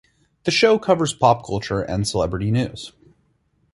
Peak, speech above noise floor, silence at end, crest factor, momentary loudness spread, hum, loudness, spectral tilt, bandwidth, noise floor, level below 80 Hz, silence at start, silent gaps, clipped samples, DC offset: -2 dBFS; 45 dB; 0.85 s; 20 dB; 12 LU; none; -20 LUFS; -5 dB/octave; 11.5 kHz; -64 dBFS; -44 dBFS; 0.45 s; none; under 0.1%; under 0.1%